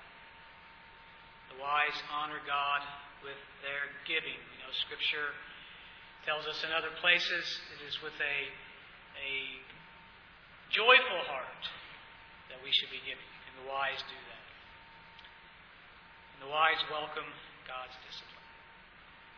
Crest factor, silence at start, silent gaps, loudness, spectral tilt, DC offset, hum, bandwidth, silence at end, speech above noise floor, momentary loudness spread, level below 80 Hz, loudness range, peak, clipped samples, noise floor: 28 dB; 0 s; none; -33 LUFS; -2 dB/octave; under 0.1%; none; 5.4 kHz; 0 s; 22 dB; 25 LU; -68 dBFS; 7 LU; -10 dBFS; under 0.1%; -56 dBFS